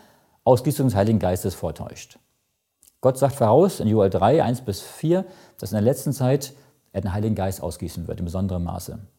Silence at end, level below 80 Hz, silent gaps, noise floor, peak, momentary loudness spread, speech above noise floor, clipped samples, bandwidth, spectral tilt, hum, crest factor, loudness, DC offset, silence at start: 0.15 s; -48 dBFS; none; -73 dBFS; -2 dBFS; 14 LU; 51 dB; under 0.1%; 17 kHz; -7 dB/octave; none; 20 dB; -22 LUFS; under 0.1%; 0.45 s